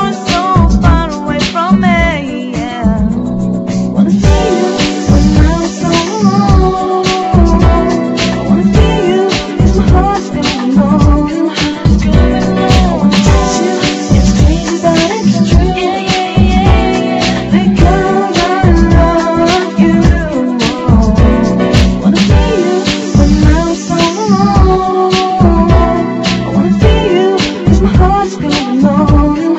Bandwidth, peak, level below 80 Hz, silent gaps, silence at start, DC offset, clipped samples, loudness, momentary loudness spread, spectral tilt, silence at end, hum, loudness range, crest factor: 8.2 kHz; 0 dBFS; -16 dBFS; none; 0 s; under 0.1%; 0.9%; -10 LUFS; 5 LU; -6 dB/octave; 0 s; none; 2 LU; 8 dB